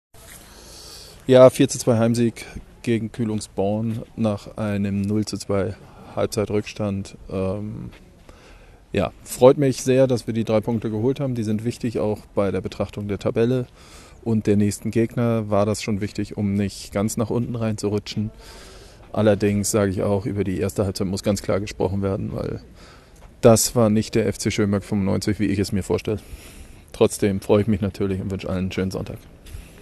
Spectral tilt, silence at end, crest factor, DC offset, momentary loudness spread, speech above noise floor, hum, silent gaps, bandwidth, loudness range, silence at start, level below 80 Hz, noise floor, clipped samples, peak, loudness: -6 dB/octave; 0 s; 22 dB; under 0.1%; 15 LU; 26 dB; none; none; 13 kHz; 5 LU; 0.15 s; -44 dBFS; -47 dBFS; under 0.1%; 0 dBFS; -22 LUFS